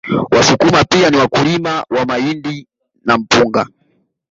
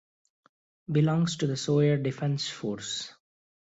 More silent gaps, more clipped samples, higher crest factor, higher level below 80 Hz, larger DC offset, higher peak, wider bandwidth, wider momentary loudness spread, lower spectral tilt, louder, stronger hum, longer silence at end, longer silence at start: neither; neither; about the same, 14 dB vs 16 dB; first, -44 dBFS vs -66 dBFS; neither; first, 0 dBFS vs -12 dBFS; about the same, 8 kHz vs 8 kHz; first, 13 LU vs 10 LU; second, -4.5 dB/octave vs -6 dB/octave; first, -13 LUFS vs -28 LUFS; neither; about the same, 0.65 s vs 0.55 s; second, 0.05 s vs 0.9 s